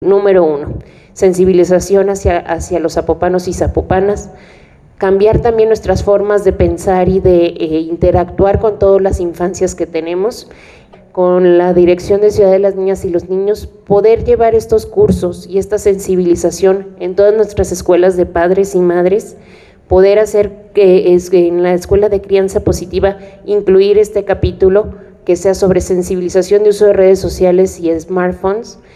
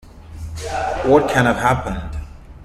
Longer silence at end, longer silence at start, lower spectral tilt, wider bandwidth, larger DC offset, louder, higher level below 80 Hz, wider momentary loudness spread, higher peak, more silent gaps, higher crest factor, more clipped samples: first, 0.2 s vs 0 s; about the same, 0 s vs 0.05 s; about the same, -6.5 dB/octave vs -6 dB/octave; second, 13 kHz vs 15 kHz; neither; first, -11 LUFS vs -18 LUFS; about the same, -30 dBFS vs -34 dBFS; second, 8 LU vs 18 LU; about the same, 0 dBFS vs -2 dBFS; neither; second, 10 dB vs 18 dB; neither